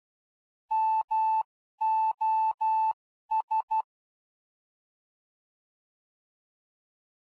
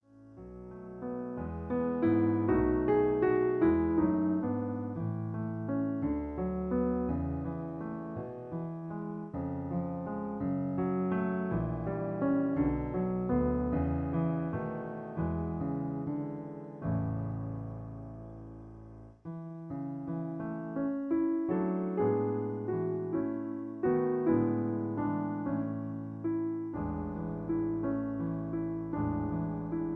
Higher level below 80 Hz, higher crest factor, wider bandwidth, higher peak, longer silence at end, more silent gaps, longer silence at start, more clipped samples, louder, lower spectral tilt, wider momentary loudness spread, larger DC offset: second, -88 dBFS vs -50 dBFS; second, 10 dB vs 16 dB; first, 4.7 kHz vs 3.6 kHz; second, -22 dBFS vs -16 dBFS; first, 3.4 s vs 0 s; first, 1.04-1.08 s, 1.45-1.78 s, 2.54-2.58 s, 2.93-3.29 s, 3.43-3.48 s, 3.63-3.68 s vs none; first, 0.7 s vs 0.15 s; neither; first, -28 LUFS vs -33 LUFS; second, -0.5 dB/octave vs -12 dB/octave; second, 6 LU vs 12 LU; neither